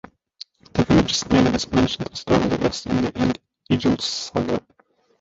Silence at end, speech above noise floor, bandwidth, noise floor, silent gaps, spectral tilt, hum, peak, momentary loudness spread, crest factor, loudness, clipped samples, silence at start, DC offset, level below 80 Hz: 0.6 s; 24 dB; 8 kHz; -45 dBFS; none; -5 dB/octave; none; -2 dBFS; 10 LU; 20 dB; -21 LUFS; under 0.1%; 0.75 s; under 0.1%; -40 dBFS